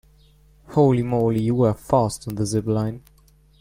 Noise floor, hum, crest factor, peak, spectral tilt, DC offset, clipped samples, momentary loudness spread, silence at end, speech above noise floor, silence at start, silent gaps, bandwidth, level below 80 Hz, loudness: -53 dBFS; none; 16 dB; -6 dBFS; -7.5 dB/octave; under 0.1%; under 0.1%; 8 LU; 0.6 s; 33 dB; 0.7 s; none; 16 kHz; -48 dBFS; -21 LUFS